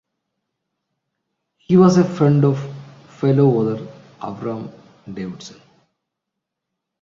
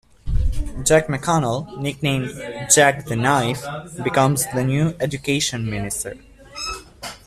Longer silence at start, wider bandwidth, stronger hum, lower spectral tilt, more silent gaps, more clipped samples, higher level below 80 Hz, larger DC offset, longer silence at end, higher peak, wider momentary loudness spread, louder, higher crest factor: first, 1.7 s vs 0.25 s; second, 7.6 kHz vs 15 kHz; neither; first, -8.5 dB/octave vs -4 dB/octave; neither; neither; second, -58 dBFS vs -32 dBFS; neither; first, 1.55 s vs 0.1 s; about the same, -2 dBFS vs 0 dBFS; first, 23 LU vs 13 LU; first, -17 LUFS vs -20 LUFS; about the same, 18 dB vs 20 dB